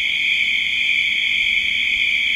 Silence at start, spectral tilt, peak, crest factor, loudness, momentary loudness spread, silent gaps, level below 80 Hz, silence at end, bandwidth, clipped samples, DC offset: 0 s; 1 dB/octave; -6 dBFS; 12 dB; -16 LUFS; 1 LU; none; -50 dBFS; 0 s; 16 kHz; under 0.1%; under 0.1%